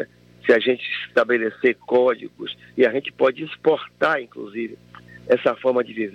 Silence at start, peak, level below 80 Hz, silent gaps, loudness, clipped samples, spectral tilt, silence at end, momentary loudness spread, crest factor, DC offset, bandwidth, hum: 0 s; -4 dBFS; -66 dBFS; none; -21 LUFS; under 0.1%; -6 dB/octave; 0 s; 13 LU; 18 dB; under 0.1%; 7 kHz; none